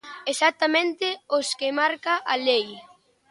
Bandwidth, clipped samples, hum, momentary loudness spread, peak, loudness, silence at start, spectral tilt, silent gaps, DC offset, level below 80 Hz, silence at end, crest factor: 11.5 kHz; under 0.1%; none; 6 LU; -8 dBFS; -23 LUFS; 0.05 s; -1 dB/octave; none; under 0.1%; -78 dBFS; 0.5 s; 18 dB